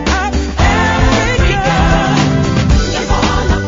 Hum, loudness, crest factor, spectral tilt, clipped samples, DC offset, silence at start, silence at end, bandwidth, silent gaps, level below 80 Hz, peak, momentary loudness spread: none; -12 LUFS; 12 dB; -5 dB/octave; under 0.1%; under 0.1%; 0 s; 0 s; 7.8 kHz; none; -16 dBFS; 0 dBFS; 3 LU